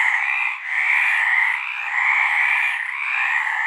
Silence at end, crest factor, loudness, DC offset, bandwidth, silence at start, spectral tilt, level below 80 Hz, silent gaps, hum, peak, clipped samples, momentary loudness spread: 0 s; 14 dB; -18 LUFS; under 0.1%; 15 kHz; 0 s; 5 dB/octave; -78 dBFS; none; none; -6 dBFS; under 0.1%; 6 LU